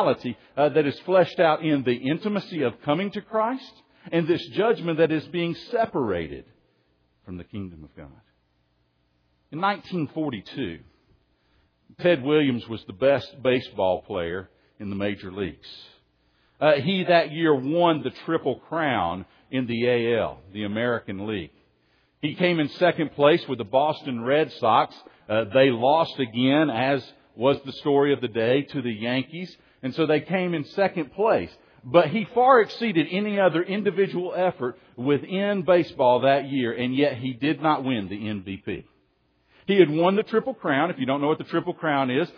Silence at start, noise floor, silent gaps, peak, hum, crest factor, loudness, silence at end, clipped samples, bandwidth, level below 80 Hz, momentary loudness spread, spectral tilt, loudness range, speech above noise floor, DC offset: 0 s; -68 dBFS; none; -4 dBFS; none; 22 dB; -24 LUFS; 0.05 s; under 0.1%; 5.4 kHz; -62 dBFS; 13 LU; -8 dB/octave; 8 LU; 45 dB; under 0.1%